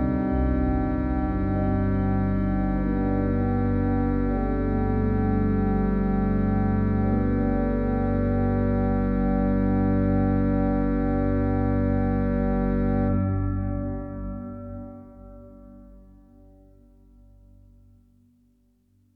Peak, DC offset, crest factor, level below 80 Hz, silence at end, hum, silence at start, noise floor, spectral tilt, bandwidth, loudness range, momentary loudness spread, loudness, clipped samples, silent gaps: -12 dBFS; under 0.1%; 12 dB; -32 dBFS; 3.15 s; none; 0 s; -63 dBFS; -12 dB/octave; 4.3 kHz; 8 LU; 5 LU; -24 LUFS; under 0.1%; none